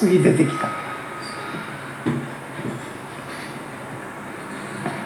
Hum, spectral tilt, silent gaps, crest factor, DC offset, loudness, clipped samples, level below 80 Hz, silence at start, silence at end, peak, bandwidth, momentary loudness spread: none; -6 dB/octave; none; 20 dB; under 0.1%; -26 LUFS; under 0.1%; -62 dBFS; 0 s; 0 s; -4 dBFS; 18 kHz; 15 LU